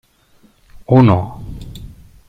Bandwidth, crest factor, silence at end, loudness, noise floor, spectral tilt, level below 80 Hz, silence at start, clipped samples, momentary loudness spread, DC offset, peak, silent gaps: 7.8 kHz; 16 dB; 0.4 s; -13 LUFS; -52 dBFS; -9.5 dB/octave; -38 dBFS; 0.9 s; under 0.1%; 24 LU; under 0.1%; -2 dBFS; none